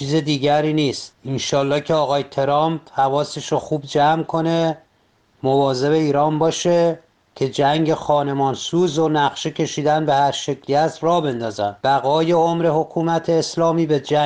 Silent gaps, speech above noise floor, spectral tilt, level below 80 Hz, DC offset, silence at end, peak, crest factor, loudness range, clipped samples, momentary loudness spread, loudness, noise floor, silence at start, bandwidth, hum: none; 42 dB; -5.5 dB/octave; -58 dBFS; under 0.1%; 0 s; -4 dBFS; 14 dB; 2 LU; under 0.1%; 6 LU; -19 LUFS; -60 dBFS; 0 s; 9.8 kHz; none